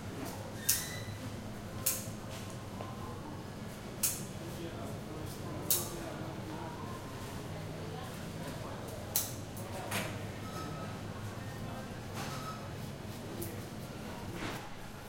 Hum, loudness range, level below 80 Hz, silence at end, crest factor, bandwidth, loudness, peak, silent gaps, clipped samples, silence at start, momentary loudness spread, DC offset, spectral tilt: none; 5 LU; -56 dBFS; 0 s; 32 dB; 16.5 kHz; -39 LUFS; -8 dBFS; none; under 0.1%; 0 s; 10 LU; under 0.1%; -3.5 dB/octave